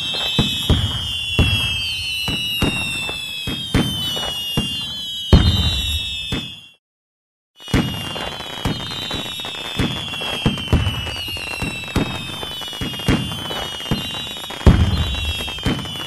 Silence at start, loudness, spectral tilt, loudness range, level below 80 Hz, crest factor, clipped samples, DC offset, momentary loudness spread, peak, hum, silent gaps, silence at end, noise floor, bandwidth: 0 s; -20 LUFS; -4.5 dB/octave; 5 LU; -28 dBFS; 20 dB; under 0.1%; under 0.1%; 9 LU; -2 dBFS; none; 6.79-7.54 s; 0 s; under -90 dBFS; 14 kHz